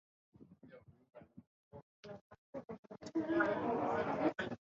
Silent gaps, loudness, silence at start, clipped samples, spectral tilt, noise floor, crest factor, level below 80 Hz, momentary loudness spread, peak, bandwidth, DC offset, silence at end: 1.47-1.71 s, 1.83-2.03 s, 2.21-2.30 s, 2.38-2.53 s, 2.79-2.83 s; -37 LUFS; 0.4 s; under 0.1%; -5 dB/octave; -61 dBFS; 20 dB; -72 dBFS; 25 LU; -20 dBFS; 7.4 kHz; under 0.1%; 0.1 s